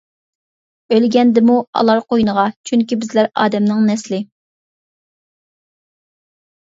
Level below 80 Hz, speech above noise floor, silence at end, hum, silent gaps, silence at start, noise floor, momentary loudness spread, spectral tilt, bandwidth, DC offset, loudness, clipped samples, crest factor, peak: -58 dBFS; over 76 dB; 2.5 s; none; 1.67-1.73 s, 2.56-2.64 s; 0.9 s; under -90 dBFS; 7 LU; -6 dB/octave; 7.8 kHz; under 0.1%; -15 LUFS; under 0.1%; 16 dB; 0 dBFS